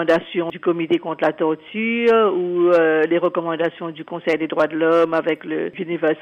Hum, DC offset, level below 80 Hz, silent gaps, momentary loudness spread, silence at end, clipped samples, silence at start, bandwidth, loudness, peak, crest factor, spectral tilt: none; under 0.1%; -66 dBFS; none; 10 LU; 0 s; under 0.1%; 0 s; 7 kHz; -19 LUFS; -6 dBFS; 12 dB; -7 dB/octave